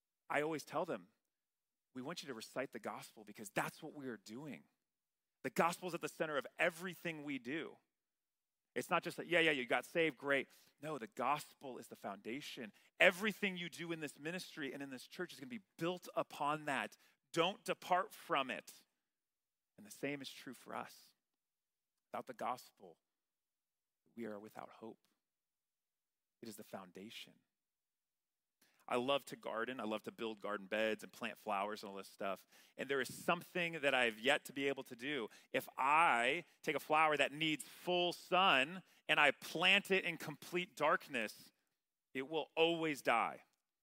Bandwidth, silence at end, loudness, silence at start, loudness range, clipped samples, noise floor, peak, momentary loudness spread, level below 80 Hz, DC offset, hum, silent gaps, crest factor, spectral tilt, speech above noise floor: 16 kHz; 0.45 s; -39 LUFS; 0.3 s; 17 LU; under 0.1%; under -90 dBFS; -14 dBFS; 19 LU; -88 dBFS; under 0.1%; none; none; 26 dB; -3.5 dB/octave; over 50 dB